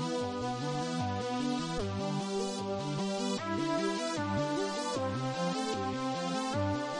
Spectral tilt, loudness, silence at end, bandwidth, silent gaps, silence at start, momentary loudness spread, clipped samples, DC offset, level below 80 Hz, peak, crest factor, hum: -5 dB/octave; -34 LUFS; 0 s; 11.5 kHz; none; 0 s; 2 LU; under 0.1%; under 0.1%; -58 dBFS; -20 dBFS; 14 dB; none